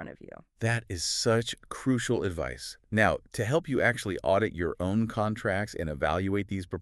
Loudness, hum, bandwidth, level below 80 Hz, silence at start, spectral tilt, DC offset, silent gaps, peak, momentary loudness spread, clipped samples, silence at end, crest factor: -29 LUFS; none; 13.5 kHz; -50 dBFS; 0 s; -5 dB/octave; under 0.1%; none; -10 dBFS; 9 LU; under 0.1%; 0 s; 20 dB